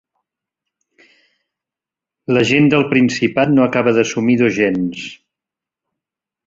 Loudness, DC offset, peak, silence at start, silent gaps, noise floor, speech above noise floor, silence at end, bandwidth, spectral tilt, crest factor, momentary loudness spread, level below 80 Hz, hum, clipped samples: -15 LUFS; under 0.1%; 0 dBFS; 2.3 s; none; -87 dBFS; 73 dB; 1.35 s; 7.8 kHz; -6 dB/octave; 18 dB; 11 LU; -56 dBFS; none; under 0.1%